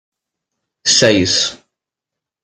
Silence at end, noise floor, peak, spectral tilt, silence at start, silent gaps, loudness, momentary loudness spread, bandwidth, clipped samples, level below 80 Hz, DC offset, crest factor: 0.9 s; -84 dBFS; 0 dBFS; -2.5 dB/octave; 0.85 s; none; -13 LUFS; 9 LU; 13 kHz; under 0.1%; -56 dBFS; under 0.1%; 18 dB